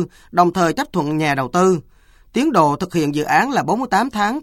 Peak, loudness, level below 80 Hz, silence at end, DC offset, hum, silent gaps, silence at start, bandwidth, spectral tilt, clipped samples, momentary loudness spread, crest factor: 0 dBFS; -18 LUFS; -50 dBFS; 0 s; under 0.1%; none; none; 0 s; 16.5 kHz; -5.5 dB/octave; under 0.1%; 5 LU; 18 dB